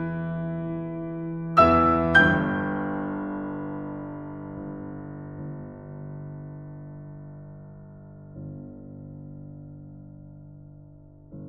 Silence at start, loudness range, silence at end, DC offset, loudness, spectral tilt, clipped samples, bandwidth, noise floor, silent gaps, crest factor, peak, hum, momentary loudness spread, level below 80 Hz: 0 s; 21 LU; 0 s; under 0.1%; -25 LUFS; -8 dB/octave; under 0.1%; 8.8 kHz; -49 dBFS; none; 24 dB; -6 dBFS; none; 27 LU; -48 dBFS